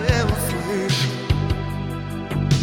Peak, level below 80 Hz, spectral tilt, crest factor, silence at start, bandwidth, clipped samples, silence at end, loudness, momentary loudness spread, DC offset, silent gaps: -4 dBFS; -32 dBFS; -5.5 dB/octave; 16 dB; 0 s; 17 kHz; under 0.1%; 0 s; -23 LUFS; 8 LU; under 0.1%; none